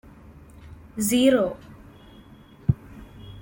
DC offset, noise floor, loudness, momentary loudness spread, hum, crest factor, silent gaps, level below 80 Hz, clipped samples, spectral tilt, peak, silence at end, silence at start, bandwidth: under 0.1%; -49 dBFS; -23 LUFS; 26 LU; none; 20 dB; none; -48 dBFS; under 0.1%; -5.5 dB/octave; -6 dBFS; 0 s; 0.65 s; 17 kHz